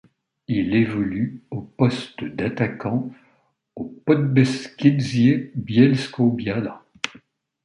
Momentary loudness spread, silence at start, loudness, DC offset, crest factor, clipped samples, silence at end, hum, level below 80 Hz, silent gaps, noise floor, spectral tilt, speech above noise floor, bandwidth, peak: 14 LU; 0.5 s; -21 LUFS; under 0.1%; 20 dB; under 0.1%; 0.55 s; none; -54 dBFS; none; -64 dBFS; -7 dB/octave; 43 dB; 10.5 kHz; -2 dBFS